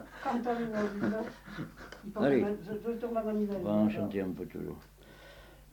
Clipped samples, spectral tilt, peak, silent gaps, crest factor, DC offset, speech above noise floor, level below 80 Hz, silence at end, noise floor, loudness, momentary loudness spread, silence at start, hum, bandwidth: under 0.1%; -7.5 dB/octave; -14 dBFS; none; 20 dB; under 0.1%; 21 dB; -58 dBFS; 0 s; -54 dBFS; -34 LUFS; 17 LU; 0 s; none; 19 kHz